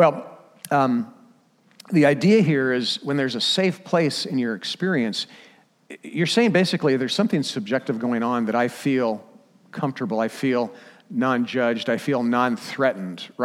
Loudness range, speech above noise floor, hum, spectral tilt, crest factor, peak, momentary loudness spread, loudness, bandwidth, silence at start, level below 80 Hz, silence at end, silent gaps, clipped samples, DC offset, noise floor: 4 LU; 36 dB; none; -5.5 dB/octave; 18 dB; -4 dBFS; 12 LU; -22 LUFS; 15.5 kHz; 0 s; -76 dBFS; 0 s; none; under 0.1%; under 0.1%; -58 dBFS